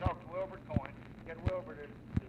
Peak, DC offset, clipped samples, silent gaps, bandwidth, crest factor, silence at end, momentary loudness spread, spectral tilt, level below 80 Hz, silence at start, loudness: -18 dBFS; under 0.1%; under 0.1%; none; 8.4 kHz; 22 dB; 0 s; 10 LU; -9 dB/octave; -48 dBFS; 0 s; -41 LUFS